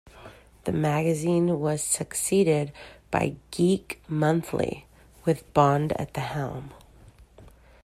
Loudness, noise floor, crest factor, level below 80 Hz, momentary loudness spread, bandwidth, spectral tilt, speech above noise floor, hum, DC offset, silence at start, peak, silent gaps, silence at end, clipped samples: -26 LUFS; -52 dBFS; 22 dB; -54 dBFS; 12 LU; 15.5 kHz; -5.5 dB/octave; 27 dB; none; under 0.1%; 0.15 s; -6 dBFS; none; 0.35 s; under 0.1%